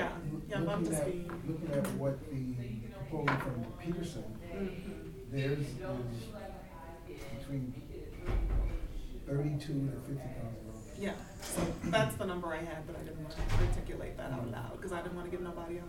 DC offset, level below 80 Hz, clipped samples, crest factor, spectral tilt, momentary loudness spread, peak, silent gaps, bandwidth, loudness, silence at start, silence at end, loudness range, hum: under 0.1%; -44 dBFS; under 0.1%; 22 dB; -6 dB/octave; 12 LU; -16 dBFS; none; 17 kHz; -38 LUFS; 0 s; 0 s; 4 LU; none